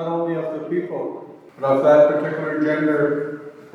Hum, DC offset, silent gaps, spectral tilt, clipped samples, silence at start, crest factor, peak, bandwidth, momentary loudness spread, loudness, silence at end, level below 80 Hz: none; under 0.1%; none; -8 dB/octave; under 0.1%; 0 s; 16 dB; -4 dBFS; 6.8 kHz; 16 LU; -20 LUFS; 0.05 s; -80 dBFS